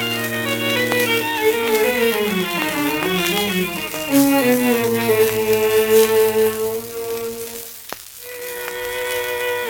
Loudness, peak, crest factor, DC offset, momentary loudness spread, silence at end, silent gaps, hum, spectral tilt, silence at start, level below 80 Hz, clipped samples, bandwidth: -18 LUFS; 0 dBFS; 18 dB; under 0.1%; 13 LU; 0 s; none; none; -3.5 dB/octave; 0 s; -52 dBFS; under 0.1%; over 20 kHz